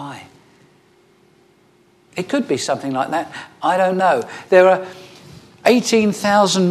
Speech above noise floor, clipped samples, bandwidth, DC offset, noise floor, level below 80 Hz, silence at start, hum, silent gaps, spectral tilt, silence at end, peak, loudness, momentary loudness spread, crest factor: 38 dB; under 0.1%; 14 kHz; under 0.1%; -54 dBFS; -66 dBFS; 0 s; none; none; -4.5 dB/octave; 0 s; 0 dBFS; -17 LUFS; 18 LU; 18 dB